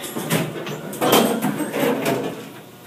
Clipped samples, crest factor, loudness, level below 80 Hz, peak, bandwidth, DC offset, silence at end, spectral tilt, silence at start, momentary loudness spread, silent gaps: under 0.1%; 22 dB; -21 LUFS; -62 dBFS; 0 dBFS; 15.5 kHz; under 0.1%; 0 s; -4 dB/octave; 0 s; 13 LU; none